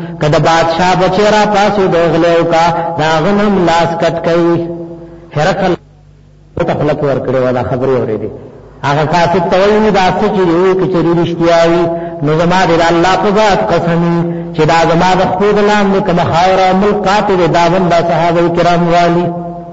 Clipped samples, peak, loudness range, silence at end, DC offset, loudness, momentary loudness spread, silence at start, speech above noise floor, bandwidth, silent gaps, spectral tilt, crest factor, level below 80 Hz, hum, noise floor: under 0.1%; 0 dBFS; 5 LU; 0 s; under 0.1%; -10 LUFS; 7 LU; 0 s; 30 dB; 8 kHz; none; -6 dB/octave; 10 dB; -34 dBFS; none; -40 dBFS